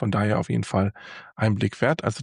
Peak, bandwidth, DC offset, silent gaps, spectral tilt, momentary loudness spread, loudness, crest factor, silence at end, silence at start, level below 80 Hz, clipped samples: -8 dBFS; 10.5 kHz; under 0.1%; none; -7 dB/octave; 8 LU; -24 LUFS; 16 dB; 0 s; 0 s; -56 dBFS; under 0.1%